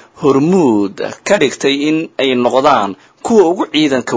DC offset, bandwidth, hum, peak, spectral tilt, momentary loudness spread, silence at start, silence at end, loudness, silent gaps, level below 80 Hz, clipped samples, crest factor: under 0.1%; 8 kHz; none; 0 dBFS; -5 dB/octave; 6 LU; 0.2 s; 0 s; -13 LUFS; none; -54 dBFS; 0.2%; 12 dB